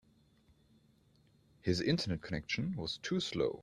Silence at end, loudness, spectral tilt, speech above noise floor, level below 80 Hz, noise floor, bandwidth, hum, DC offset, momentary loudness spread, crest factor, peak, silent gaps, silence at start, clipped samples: 0 s; -36 LUFS; -5.5 dB/octave; 33 dB; -62 dBFS; -68 dBFS; 12.5 kHz; none; under 0.1%; 7 LU; 20 dB; -18 dBFS; none; 1.65 s; under 0.1%